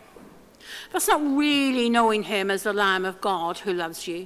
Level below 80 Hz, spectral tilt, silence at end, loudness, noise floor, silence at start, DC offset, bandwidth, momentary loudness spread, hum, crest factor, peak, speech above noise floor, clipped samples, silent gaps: -62 dBFS; -3 dB/octave; 0 s; -23 LUFS; -49 dBFS; 0.15 s; under 0.1%; 16 kHz; 9 LU; none; 18 dB; -6 dBFS; 25 dB; under 0.1%; none